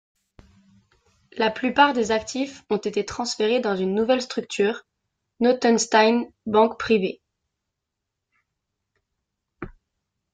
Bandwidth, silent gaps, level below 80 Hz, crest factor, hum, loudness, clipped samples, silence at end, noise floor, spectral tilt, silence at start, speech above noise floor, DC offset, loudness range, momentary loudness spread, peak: 9.4 kHz; none; -58 dBFS; 20 dB; none; -22 LUFS; under 0.1%; 0.65 s; -83 dBFS; -4 dB/octave; 1.35 s; 61 dB; under 0.1%; 5 LU; 17 LU; -4 dBFS